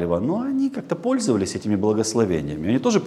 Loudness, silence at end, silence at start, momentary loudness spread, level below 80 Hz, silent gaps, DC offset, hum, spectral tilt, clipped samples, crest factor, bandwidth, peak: -22 LUFS; 0 s; 0 s; 4 LU; -54 dBFS; none; under 0.1%; none; -5.5 dB/octave; under 0.1%; 16 dB; 13 kHz; -6 dBFS